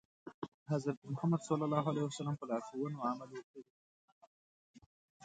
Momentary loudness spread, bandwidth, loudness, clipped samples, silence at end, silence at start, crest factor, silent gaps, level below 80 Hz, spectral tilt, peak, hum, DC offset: 16 LU; 9 kHz; -38 LUFS; under 0.1%; 0 s; 0.25 s; 22 dB; 0.34-0.42 s, 0.48-0.66 s, 0.97-1.02 s, 3.43-3.54 s, 3.70-4.21 s, 4.27-4.74 s, 4.86-5.20 s; -80 dBFS; -7 dB/octave; -18 dBFS; none; under 0.1%